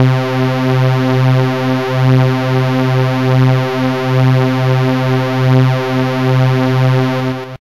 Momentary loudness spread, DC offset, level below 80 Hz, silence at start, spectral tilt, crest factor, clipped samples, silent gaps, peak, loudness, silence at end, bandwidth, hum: 4 LU; 1%; -48 dBFS; 0 s; -7.5 dB/octave; 10 dB; under 0.1%; none; -2 dBFS; -13 LUFS; 0.1 s; 7.2 kHz; none